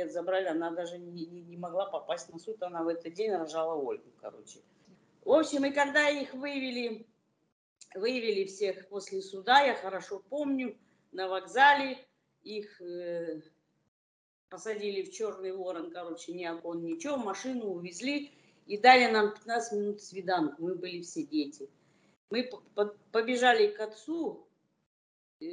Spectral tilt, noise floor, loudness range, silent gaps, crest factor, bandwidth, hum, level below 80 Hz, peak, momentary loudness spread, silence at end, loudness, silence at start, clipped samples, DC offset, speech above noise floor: -3.5 dB/octave; under -90 dBFS; 10 LU; 7.52-7.76 s, 13.88-14.48 s, 22.17-22.28 s, 24.86-25.40 s; 26 dB; 10.5 kHz; none; -86 dBFS; -6 dBFS; 18 LU; 0 s; -31 LUFS; 0 s; under 0.1%; under 0.1%; over 59 dB